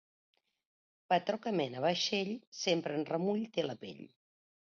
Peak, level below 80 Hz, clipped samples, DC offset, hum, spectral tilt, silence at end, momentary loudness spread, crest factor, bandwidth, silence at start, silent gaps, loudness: -16 dBFS; -84 dBFS; under 0.1%; under 0.1%; none; -3.5 dB/octave; 0.7 s; 8 LU; 20 dB; 7.2 kHz; 1.1 s; 2.47-2.52 s; -34 LUFS